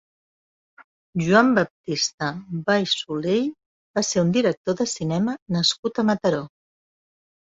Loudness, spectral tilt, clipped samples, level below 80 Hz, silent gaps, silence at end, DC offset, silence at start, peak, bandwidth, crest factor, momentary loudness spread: -22 LUFS; -4.5 dB/octave; under 0.1%; -62 dBFS; 1.70-1.84 s, 2.14-2.18 s, 3.66-3.94 s, 4.57-4.65 s, 5.42-5.46 s, 5.79-5.83 s; 1 s; under 0.1%; 1.15 s; -2 dBFS; 8 kHz; 22 dB; 10 LU